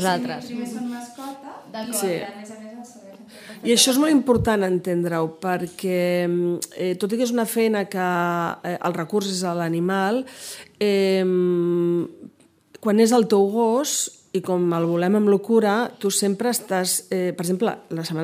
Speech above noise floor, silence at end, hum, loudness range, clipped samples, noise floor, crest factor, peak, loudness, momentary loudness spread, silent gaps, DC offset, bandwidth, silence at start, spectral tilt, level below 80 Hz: 30 dB; 0 s; none; 3 LU; under 0.1%; -51 dBFS; 20 dB; -2 dBFS; -22 LUFS; 16 LU; none; under 0.1%; 16 kHz; 0 s; -4.5 dB/octave; -56 dBFS